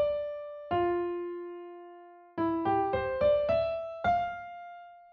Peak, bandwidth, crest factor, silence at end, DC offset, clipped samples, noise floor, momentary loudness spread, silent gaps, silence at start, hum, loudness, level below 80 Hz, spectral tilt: -16 dBFS; 6.2 kHz; 14 dB; 0.05 s; under 0.1%; under 0.1%; -52 dBFS; 19 LU; none; 0 s; none; -31 LUFS; -56 dBFS; -5 dB/octave